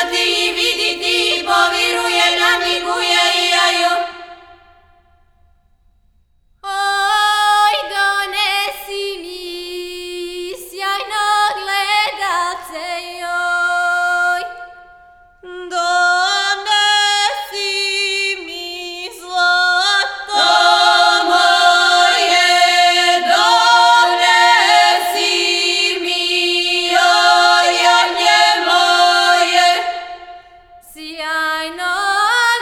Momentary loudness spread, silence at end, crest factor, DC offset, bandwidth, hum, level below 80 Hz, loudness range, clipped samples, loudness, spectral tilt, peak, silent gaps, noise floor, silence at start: 15 LU; 0 s; 16 dB; under 0.1%; 18 kHz; none; -54 dBFS; 9 LU; under 0.1%; -13 LUFS; 1 dB/octave; 0 dBFS; none; -55 dBFS; 0 s